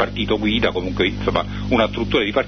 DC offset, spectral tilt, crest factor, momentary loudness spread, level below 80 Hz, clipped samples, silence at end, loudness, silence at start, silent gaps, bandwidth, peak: under 0.1%; -6.5 dB/octave; 16 dB; 3 LU; -34 dBFS; under 0.1%; 0 s; -20 LUFS; 0 s; none; 6.6 kHz; -2 dBFS